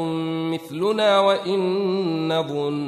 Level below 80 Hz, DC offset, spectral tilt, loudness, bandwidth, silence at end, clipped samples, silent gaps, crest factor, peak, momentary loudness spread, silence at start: -70 dBFS; under 0.1%; -6 dB/octave; -22 LUFS; 13.5 kHz; 0 s; under 0.1%; none; 16 dB; -6 dBFS; 8 LU; 0 s